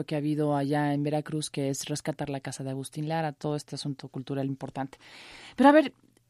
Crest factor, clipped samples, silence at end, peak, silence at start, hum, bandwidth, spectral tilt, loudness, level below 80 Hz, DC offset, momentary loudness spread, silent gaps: 22 dB; under 0.1%; 0.4 s; -6 dBFS; 0 s; none; 13 kHz; -6 dB/octave; -29 LUFS; -68 dBFS; under 0.1%; 16 LU; none